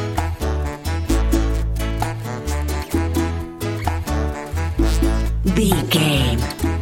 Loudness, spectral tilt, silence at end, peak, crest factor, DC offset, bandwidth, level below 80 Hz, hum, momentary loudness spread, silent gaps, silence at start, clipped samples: -21 LUFS; -5.5 dB/octave; 0 s; -4 dBFS; 16 dB; under 0.1%; 17 kHz; -24 dBFS; none; 8 LU; none; 0 s; under 0.1%